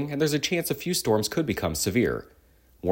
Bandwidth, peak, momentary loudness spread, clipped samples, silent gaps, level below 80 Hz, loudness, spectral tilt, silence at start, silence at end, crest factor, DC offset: 17 kHz; -10 dBFS; 4 LU; under 0.1%; none; -52 dBFS; -26 LUFS; -4.5 dB/octave; 0 s; 0 s; 16 dB; under 0.1%